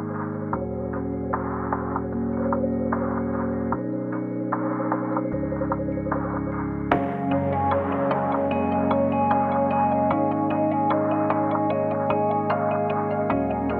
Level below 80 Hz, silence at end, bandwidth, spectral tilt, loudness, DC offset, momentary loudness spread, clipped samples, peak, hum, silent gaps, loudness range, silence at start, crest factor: -44 dBFS; 0 s; 4.6 kHz; -10.5 dB/octave; -24 LUFS; under 0.1%; 7 LU; under 0.1%; -4 dBFS; none; none; 4 LU; 0 s; 20 dB